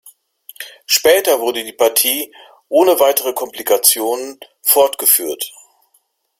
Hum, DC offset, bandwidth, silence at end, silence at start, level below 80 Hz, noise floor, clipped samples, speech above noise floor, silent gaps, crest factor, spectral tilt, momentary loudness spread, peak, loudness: none; under 0.1%; 16.5 kHz; 0.9 s; 0.6 s; -62 dBFS; -61 dBFS; under 0.1%; 47 dB; none; 16 dB; 0 dB/octave; 15 LU; 0 dBFS; -14 LUFS